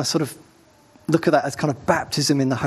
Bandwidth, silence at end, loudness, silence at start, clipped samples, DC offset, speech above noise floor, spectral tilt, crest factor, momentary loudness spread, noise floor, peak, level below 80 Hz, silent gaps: 13 kHz; 0 s; -21 LUFS; 0 s; under 0.1%; under 0.1%; 32 dB; -5 dB/octave; 20 dB; 7 LU; -53 dBFS; -2 dBFS; -58 dBFS; none